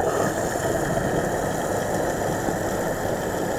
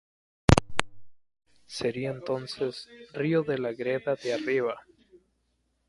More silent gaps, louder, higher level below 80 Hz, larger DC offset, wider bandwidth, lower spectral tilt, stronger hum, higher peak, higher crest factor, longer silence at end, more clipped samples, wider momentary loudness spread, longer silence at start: neither; first, -25 LUFS vs -29 LUFS; about the same, -42 dBFS vs -44 dBFS; neither; first, over 20 kHz vs 11.5 kHz; about the same, -5 dB/octave vs -6 dB/octave; neither; second, -10 dBFS vs 0 dBFS; second, 14 dB vs 30 dB; second, 0 s vs 1.1 s; neither; second, 2 LU vs 11 LU; second, 0 s vs 0.5 s